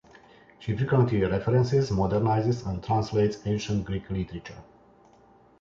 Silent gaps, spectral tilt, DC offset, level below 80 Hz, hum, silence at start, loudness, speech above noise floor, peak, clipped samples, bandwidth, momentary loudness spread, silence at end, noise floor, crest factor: none; -7.5 dB/octave; under 0.1%; -46 dBFS; none; 0.6 s; -26 LUFS; 32 dB; -10 dBFS; under 0.1%; 7.6 kHz; 10 LU; 1 s; -57 dBFS; 16 dB